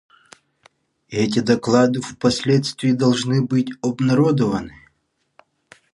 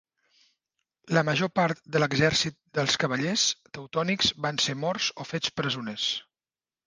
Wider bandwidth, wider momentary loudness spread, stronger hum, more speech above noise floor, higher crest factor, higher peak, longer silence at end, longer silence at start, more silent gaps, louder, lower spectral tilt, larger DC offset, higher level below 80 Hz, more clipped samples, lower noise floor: about the same, 11.5 kHz vs 10.5 kHz; about the same, 7 LU vs 7 LU; neither; second, 51 dB vs over 63 dB; about the same, 18 dB vs 20 dB; first, -2 dBFS vs -8 dBFS; first, 1.25 s vs 0.65 s; about the same, 1.1 s vs 1.05 s; neither; first, -19 LUFS vs -26 LUFS; first, -6 dB/octave vs -3.5 dB/octave; neither; first, -54 dBFS vs -60 dBFS; neither; second, -69 dBFS vs under -90 dBFS